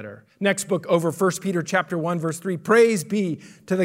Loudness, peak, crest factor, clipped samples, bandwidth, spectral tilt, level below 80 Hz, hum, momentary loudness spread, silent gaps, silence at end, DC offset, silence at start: -22 LUFS; -6 dBFS; 16 dB; under 0.1%; 16 kHz; -5 dB/octave; -72 dBFS; none; 11 LU; none; 0 s; under 0.1%; 0 s